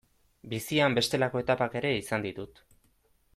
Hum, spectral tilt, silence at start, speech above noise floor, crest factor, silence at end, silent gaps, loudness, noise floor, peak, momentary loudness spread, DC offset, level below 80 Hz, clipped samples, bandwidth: none; -4.5 dB/octave; 0.45 s; 39 dB; 18 dB; 0.9 s; none; -29 LUFS; -68 dBFS; -12 dBFS; 13 LU; under 0.1%; -60 dBFS; under 0.1%; 16 kHz